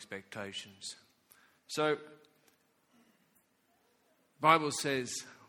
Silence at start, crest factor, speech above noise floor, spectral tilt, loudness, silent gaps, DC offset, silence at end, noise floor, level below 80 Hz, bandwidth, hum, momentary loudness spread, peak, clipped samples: 0 s; 28 dB; 39 dB; -3 dB/octave; -33 LUFS; none; under 0.1%; 0.15 s; -73 dBFS; -80 dBFS; 18.5 kHz; none; 18 LU; -10 dBFS; under 0.1%